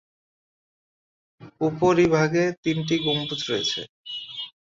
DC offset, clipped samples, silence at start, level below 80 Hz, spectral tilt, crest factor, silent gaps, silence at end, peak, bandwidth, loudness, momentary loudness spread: under 0.1%; under 0.1%; 1.4 s; -58 dBFS; -5 dB/octave; 18 dB; 2.57-2.63 s, 3.89-4.04 s; 0.2 s; -8 dBFS; 7.8 kHz; -23 LUFS; 14 LU